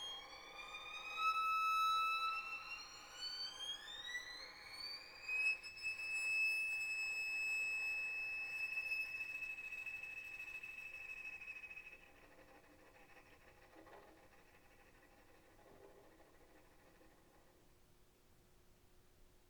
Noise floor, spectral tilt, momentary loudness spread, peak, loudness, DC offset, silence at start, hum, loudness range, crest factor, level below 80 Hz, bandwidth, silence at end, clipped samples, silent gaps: -69 dBFS; 0 dB/octave; 15 LU; -28 dBFS; -41 LUFS; under 0.1%; 0 s; none; 14 LU; 18 dB; -74 dBFS; over 20 kHz; 0.1 s; under 0.1%; none